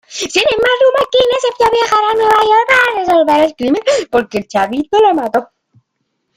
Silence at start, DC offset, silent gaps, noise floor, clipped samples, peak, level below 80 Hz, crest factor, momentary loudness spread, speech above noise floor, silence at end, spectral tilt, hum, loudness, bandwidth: 0.1 s; under 0.1%; none; -69 dBFS; under 0.1%; 0 dBFS; -48 dBFS; 12 dB; 6 LU; 57 dB; 0.95 s; -3 dB/octave; none; -12 LUFS; 16 kHz